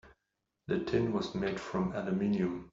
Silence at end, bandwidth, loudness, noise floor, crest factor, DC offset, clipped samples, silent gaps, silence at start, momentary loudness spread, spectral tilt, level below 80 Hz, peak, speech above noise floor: 0.05 s; 7.6 kHz; -33 LUFS; -85 dBFS; 16 dB; under 0.1%; under 0.1%; none; 0.05 s; 5 LU; -6.5 dB/octave; -58 dBFS; -18 dBFS; 52 dB